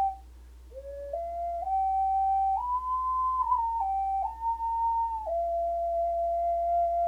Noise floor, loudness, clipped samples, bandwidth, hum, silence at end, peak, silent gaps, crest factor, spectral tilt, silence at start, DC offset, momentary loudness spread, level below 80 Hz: -49 dBFS; -29 LUFS; under 0.1%; 8.4 kHz; none; 0 s; -16 dBFS; none; 12 dB; -6.5 dB/octave; 0 s; under 0.1%; 9 LU; -48 dBFS